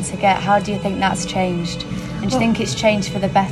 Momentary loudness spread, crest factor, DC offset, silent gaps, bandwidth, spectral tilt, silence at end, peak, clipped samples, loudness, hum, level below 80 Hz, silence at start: 7 LU; 16 dB; under 0.1%; none; 13 kHz; -5 dB/octave; 0 s; -2 dBFS; under 0.1%; -19 LUFS; none; -40 dBFS; 0 s